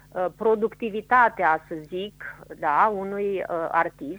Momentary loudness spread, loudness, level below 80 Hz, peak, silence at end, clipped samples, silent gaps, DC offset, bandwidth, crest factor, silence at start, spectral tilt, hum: 14 LU; -24 LUFS; -58 dBFS; -6 dBFS; 0 s; under 0.1%; none; under 0.1%; over 20 kHz; 18 dB; 0.15 s; -6.5 dB/octave; 50 Hz at -55 dBFS